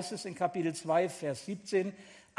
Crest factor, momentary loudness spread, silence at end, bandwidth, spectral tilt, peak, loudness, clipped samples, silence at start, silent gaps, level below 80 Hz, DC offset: 18 dB; 9 LU; 0.15 s; 12 kHz; -5 dB/octave; -16 dBFS; -34 LUFS; under 0.1%; 0 s; none; -78 dBFS; under 0.1%